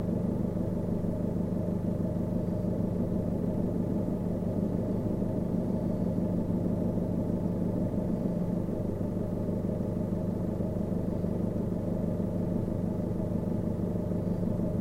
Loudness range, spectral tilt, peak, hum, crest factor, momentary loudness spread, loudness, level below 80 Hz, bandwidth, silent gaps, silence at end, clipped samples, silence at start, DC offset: 1 LU; -10.5 dB/octave; -16 dBFS; none; 14 dB; 2 LU; -31 LUFS; -44 dBFS; 11 kHz; none; 0 s; under 0.1%; 0 s; under 0.1%